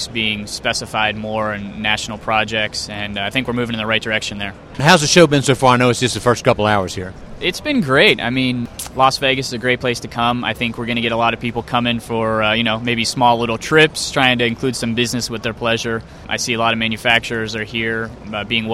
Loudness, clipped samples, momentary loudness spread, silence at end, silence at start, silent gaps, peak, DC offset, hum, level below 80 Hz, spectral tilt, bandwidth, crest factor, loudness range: -17 LUFS; under 0.1%; 10 LU; 0 s; 0 s; none; 0 dBFS; under 0.1%; none; -42 dBFS; -4 dB/octave; 16 kHz; 18 dB; 5 LU